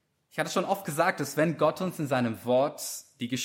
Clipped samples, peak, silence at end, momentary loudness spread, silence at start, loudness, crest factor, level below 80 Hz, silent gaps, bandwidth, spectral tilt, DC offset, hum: under 0.1%; -12 dBFS; 0 s; 10 LU; 0.35 s; -28 LUFS; 18 dB; -74 dBFS; none; 16.5 kHz; -4.5 dB/octave; under 0.1%; none